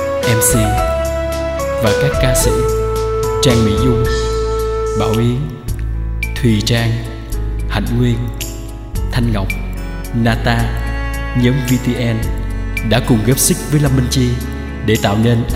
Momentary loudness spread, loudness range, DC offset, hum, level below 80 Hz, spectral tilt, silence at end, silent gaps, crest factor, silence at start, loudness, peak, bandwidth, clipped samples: 10 LU; 4 LU; under 0.1%; none; -22 dBFS; -5 dB/octave; 0 s; none; 14 dB; 0 s; -16 LUFS; 0 dBFS; 16 kHz; under 0.1%